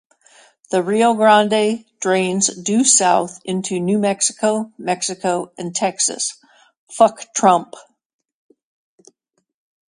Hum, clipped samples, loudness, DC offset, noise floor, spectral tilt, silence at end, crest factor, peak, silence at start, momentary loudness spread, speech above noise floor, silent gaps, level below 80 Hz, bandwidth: none; under 0.1%; -17 LUFS; under 0.1%; -62 dBFS; -3 dB/octave; 2.1 s; 18 dB; 0 dBFS; 0.7 s; 11 LU; 45 dB; 6.77-6.87 s; -68 dBFS; 11.5 kHz